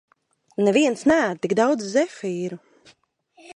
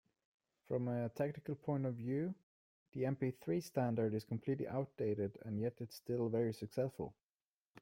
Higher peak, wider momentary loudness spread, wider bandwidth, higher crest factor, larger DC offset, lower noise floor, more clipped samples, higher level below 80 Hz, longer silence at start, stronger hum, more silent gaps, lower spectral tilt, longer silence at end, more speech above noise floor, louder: first, -6 dBFS vs -24 dBFS; first, 13 LU vs 6 LU; second, 11 kHz vs 16.5 kHz; about the same, 18 dB vs 16 dB; neither; second, -59 dBFS vs under -90 dBFS; neither; first, -64 dBFS vs -76 dBFS; about the same, 0.6 s vs 0.7 s; neither; second, none vs 2.43-2.92 s, 7.23-7.75 s; second, -5 dB/octave vs -8 dB/octave; about the same, 0.05 s vs 0 s; second, 38 dB vs over 50 dB; first, -21 LUFS vs -41 LUFS